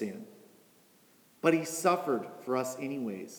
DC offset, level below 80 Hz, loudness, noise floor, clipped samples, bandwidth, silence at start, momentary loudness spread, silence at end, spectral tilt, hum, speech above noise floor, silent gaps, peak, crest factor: under 0.1%; -90 dBFS; -32 LUFS; -63 dBFS; under 0.1%; over 20 kHz; 0 s; 11 LU; 0 s; -4.5 dB/octave; none; 32 dB; none; -12 dBFS; 20 dB